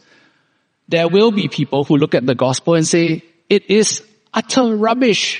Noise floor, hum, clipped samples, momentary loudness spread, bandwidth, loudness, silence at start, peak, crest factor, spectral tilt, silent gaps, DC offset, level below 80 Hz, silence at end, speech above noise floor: -63 dBFS; none; under 0.1%; 7 LU; 10 kHz; -15 LUFS; 0.9 s; 0 dBFS; 16 dB; -4.5 dB/octave; none; under 0.1%; -62 dBFS; 0 s; 49 dB